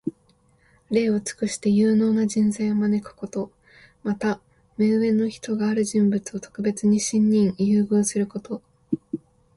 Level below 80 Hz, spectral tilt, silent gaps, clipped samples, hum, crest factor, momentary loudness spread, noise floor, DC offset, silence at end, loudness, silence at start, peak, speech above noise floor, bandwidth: -60 dBFS; -6 dB/octave; none; under 0.1%; none; 14 dB; 14 LU; -61 dBFS; under 0.1%; 0.4 s; -23 LUFS; 0.05 s; -8 dBFS; 39 dB; 11.5 kHz